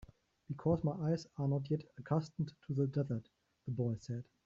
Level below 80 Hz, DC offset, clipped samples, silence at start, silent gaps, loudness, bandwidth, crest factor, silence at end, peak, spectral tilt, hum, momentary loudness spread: -66 dBFS; under 0.1%; under 0.1%; 0 s; none; -38 LUFS; 7.6 kHz; 18 dB; 0.2 s; -20 dBFS; -9.5 dB/octave; none; 9 LU